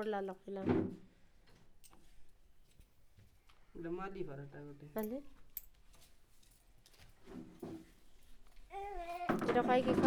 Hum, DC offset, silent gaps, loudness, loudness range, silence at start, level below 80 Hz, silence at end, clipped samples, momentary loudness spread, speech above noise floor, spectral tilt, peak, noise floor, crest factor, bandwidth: none; under 0.1%; none; -40 LUFS; 13 LU; 0 s; -62 dBFS; 0 s; under 0.1%; 20 LU; 26 dB; -6.5 dB/octave; -16 dBFS; -64 dBFS; 26 dB; over 20 kHz